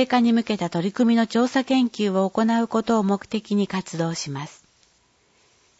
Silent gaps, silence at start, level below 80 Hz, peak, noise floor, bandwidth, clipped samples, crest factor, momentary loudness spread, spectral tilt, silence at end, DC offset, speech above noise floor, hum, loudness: none; 0 s; -64 dBFS; -6 dBFS; -62 dBFS; 8 kHz; under 0.1%; 16 dB; 7 LU; -5.5 dB/octave; 1.3 s; under 0.1%; 41 dB; none; -22 LUFS